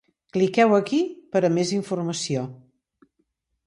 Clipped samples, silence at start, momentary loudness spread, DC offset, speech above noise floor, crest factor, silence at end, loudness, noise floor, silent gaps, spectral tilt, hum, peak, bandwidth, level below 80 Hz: under 0.1%; 0.35 s; 10 LU; under 0.1%; 52 dB; 18 dB; 1.1 s; -23 LUFS; -73 dBFS; none; -5.5 dB/octave; none; -6 dBFS; 11.5 kHz; -68 dBFS